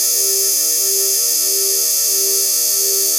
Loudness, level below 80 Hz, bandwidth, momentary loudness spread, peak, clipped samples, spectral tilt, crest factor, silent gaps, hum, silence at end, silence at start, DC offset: -13 LUFS; under -90 dBFS; 16 kHz; 0 LU; -4 dBFS; under 0.1%; 2.5 dB/octave; 12 dB; none; none; 0 s; 0 s; under 0.1%